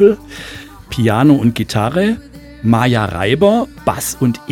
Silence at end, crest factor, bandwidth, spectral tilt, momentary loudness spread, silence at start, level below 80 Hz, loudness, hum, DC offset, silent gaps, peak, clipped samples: 0 s; 14 dB; 17.5 kHz; -6 dB/octave; 14 LU; 0 s; -40 dBFS; -15 LUFS; none; under 0.1%; none; 0 dBFS; under 0.1%